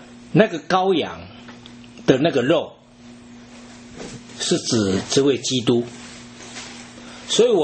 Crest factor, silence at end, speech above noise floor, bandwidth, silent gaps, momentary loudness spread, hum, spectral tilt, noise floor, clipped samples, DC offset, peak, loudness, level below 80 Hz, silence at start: 22 dB; 0 s; 26 dB; 8.8 kHz; none; 22 LU; none; -4.5 dB/octave; -44 dBFS; under 0.1%; under 0.1%; 0 dBFS; -20 LUFS; -56 dBFS; 0 s